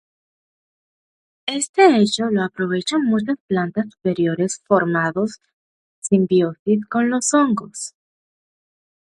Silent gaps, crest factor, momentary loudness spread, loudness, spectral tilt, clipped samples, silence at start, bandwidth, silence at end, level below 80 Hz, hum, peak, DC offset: 1.69-1.74 s, 3.40-3.48 s, 5.53-6.02 s, 6.59-6.66 s; 18 dB; 11 LU; -19 LUFS; -4.5 dB/octave; under 0.1%; 1.45 s; 11.5 kHz; 1.3 s; -64 dBFS; none; -2 dBFS; under 0.1%